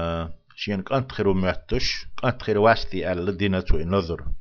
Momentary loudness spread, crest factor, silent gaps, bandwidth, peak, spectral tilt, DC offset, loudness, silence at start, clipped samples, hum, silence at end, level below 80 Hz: 9 LU; 20 dB; none; 7 kHz; -4 dBFS; -6 dB/octave; under 0.1%; -24 LUFS; 0 s; under 0.1%; none; 0 s; -32 dBFS